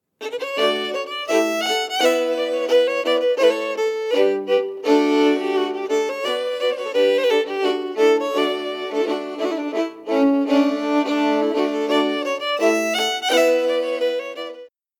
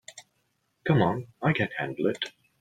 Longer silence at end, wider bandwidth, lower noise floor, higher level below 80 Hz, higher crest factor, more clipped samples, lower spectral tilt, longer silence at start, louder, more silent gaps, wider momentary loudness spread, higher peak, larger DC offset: about the same, 0.35 s vs 0.3 s; first, 19 kHz vs 9.4 kHz; second, -40 dBFS vs -74 dBFS; second, -74 dBFS vs -60 dBFS; about the same, 16 dB vs 20 dB; neither; second, -2.5 dB/octave vs -6.5 dB/octave; about the same, 0.2 s vs 0.1 s; first, -20 LUFS vs -28 LUFS; neither; second, 7 LU vs 12 LU; first, -4 dBFS vs -8 dBFS; neither